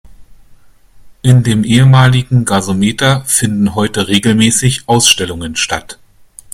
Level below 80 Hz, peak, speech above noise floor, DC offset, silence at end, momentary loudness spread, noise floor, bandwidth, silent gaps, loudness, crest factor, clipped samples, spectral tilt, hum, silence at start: -40 dBFS; 0 dBFS; 30 dB; under 0.1%; 0.6 s; 8 LU; -41 dBFS; 16 kHz; none; -11 LUFS; 12 dB; 0.1%; -4.5 dB/octave; none; 0.2 s